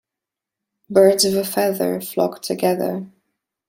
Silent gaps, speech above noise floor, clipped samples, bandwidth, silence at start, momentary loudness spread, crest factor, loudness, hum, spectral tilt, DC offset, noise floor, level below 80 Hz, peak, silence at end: none; 68 dB; under 0.1%; 16.5 kHz; 0.9 s; 9 LU; 18 dB; -19 LUFS; none; -4 dB/octave; under 0.1%; -86 dBFS; -64 dBFS; -2 dBFS; 0.6 s